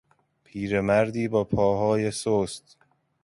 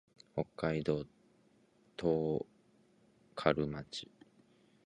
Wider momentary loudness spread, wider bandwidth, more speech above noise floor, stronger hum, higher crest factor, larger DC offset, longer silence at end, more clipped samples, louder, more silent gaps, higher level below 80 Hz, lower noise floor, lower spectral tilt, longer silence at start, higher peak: second, 12 LU vs 17 LU; about the same, 11.5 kHz vs 10.5 kHz; first, 39 dB vs 34 dB; neither; second, 16 dB vs 28 dB; neither; second, 0.65 s vs 0.8 s; neither; first, -25 LUFS vs -37 LUFS; neither; first, -52 dBFS vs -64 dBFS; second, -63 dBFS vs -69 dBFS; about the same, -6 dB/octave vs -7 dB/octave; first, 0.55 s vs 0.35 s; about the same, -10 dBFS vs -10 dBFS